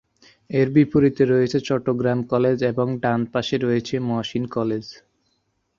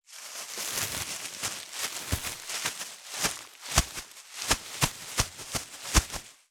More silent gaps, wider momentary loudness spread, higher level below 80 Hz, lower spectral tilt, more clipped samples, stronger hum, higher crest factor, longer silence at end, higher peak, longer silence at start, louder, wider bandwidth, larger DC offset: neither; second, 8 LU vs 11 LU; second, -54 dBFS vs -40 dBFS; first, -7.5 dB/octave vs -2 dB/octave; neither; neither; second, 18 dB vs 28 dB; first, 0.85 s vs 0.15 s; about the same, -4 dBFS vs -4 dBFS; first, 0.5 s vs 0.1 s; first, -21 LUFS vs -31 LUFS; second, 7.4 kHz vs over 20 kHz; neither